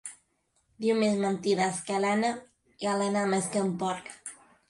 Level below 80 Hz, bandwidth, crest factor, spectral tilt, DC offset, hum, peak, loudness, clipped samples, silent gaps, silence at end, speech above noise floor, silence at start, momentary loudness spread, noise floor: -72 dBFS; 11.5 kHz; 14 dB; -4.5 dB/octave; under 0.1%; none; -14 dBFS; -28 LUFS; under 0.1%; none; 0.35 s; 45 dB; 0.05 s; 15 LU; -73 dBFS